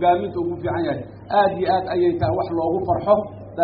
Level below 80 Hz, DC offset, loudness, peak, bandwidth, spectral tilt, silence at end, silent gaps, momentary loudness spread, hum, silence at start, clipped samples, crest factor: -48 dBFS; under 0.1%; -21 LUFS; -4 dBFS; 5 kHz; -6 dB/octave; 0 s; none; 7 LU; none; 0 s; under 0.1%; 16 dB